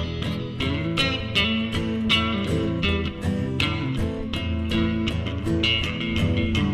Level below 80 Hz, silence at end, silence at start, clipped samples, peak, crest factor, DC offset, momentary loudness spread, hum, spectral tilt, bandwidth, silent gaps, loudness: -36 dBFS; 0 s; 0 s; under 0.1%; -8 dBFS; 16 dB; under 0.1%; 6 LU; none; -6 dB/octave; 13.5 kHz; none; -24 LUFS